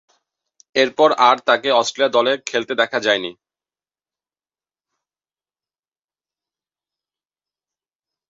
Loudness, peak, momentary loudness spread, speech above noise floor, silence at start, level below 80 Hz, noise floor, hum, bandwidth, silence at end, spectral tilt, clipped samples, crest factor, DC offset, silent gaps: -17 LUFS; -2 dBFS; 8 LU; over 73 dB; 0.75 s; -72 dBFS; under -90 dBFS; none; 7.8 kHz; 4.95 s; -2.5 dB/octave; under 0.1%; 20 dB; under 0.1%; none